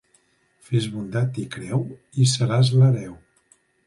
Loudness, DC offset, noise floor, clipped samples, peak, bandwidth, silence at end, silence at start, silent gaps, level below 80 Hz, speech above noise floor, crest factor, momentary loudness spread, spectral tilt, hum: -22 LUFS; under 0.1%; -63 dBFS; under 0.1%; -8 dBFS; 11.5 kHz; 0.7 s; 0.7 s; none; -58 dBFS; 42 dB; 14 dB; 11 LU; -6 dB/octave; none